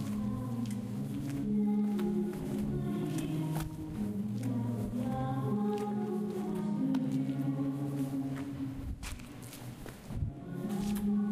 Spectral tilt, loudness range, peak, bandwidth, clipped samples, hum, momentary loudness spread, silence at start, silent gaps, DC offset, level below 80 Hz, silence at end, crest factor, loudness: -7.5 dB/octave; 4 LU; -22 dBFS; 15.5 kHz; under 0.1%; none; 10 LU; 0 s; none; under 0.1%; -52 dBFS; 0 s; 12 dB; -35 LUFS